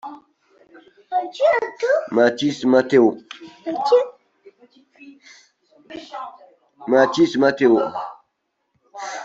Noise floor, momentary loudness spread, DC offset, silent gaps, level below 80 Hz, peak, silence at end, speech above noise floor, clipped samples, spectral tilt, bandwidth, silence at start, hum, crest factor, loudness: -73 dBFS; 20 LU; under 0.1%; none; -66 dBFS; -2 dBFS; 0 s; 56 dB; under 0.1%; -5.5 dB/octave; 7.8 kHz; 0.05 s; none; 18 dB; -18 LUFS